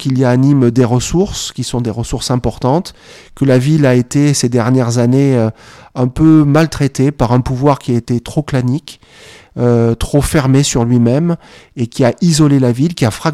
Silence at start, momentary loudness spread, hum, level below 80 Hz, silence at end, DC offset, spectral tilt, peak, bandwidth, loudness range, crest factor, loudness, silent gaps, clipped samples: 0 s; 9 LU; none; -32 dBFS; 0 s; under 0.1%; -6.5 dB/octave; 0 dBFS; 14.5 kHz; 3 LU; 12 dB; -13 LUFS; none; under 0.1%